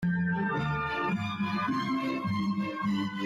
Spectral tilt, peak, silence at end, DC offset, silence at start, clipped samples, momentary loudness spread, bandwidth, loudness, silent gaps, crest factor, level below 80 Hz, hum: -7 dB/octave; -20 dBFS; 0 s; under 0.1%; 0 s; under 0.1%; 2 LU; 10.5 kHz; -30 LUFS; none; 10 dB; -58 dBFS; none